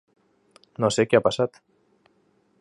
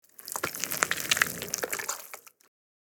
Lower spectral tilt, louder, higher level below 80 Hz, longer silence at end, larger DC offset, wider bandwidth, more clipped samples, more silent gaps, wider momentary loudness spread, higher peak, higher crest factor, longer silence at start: first, -5 dB/octave vs -0.5 dB/octave; first, -23 LUFS vs -29 LUFS; first, -62 dBFS vs -70 dBFS; first, 1.15 s vs 0.7 s; neither; second, 11.5 kHz vs over 20 kHz; neither; neither; second, 9 LU vs 13 LU; about the same, -4 dBFS vs -2 dBFS; second, 22 dB vs 32 dB; first, 0.8 s vs 0.2 s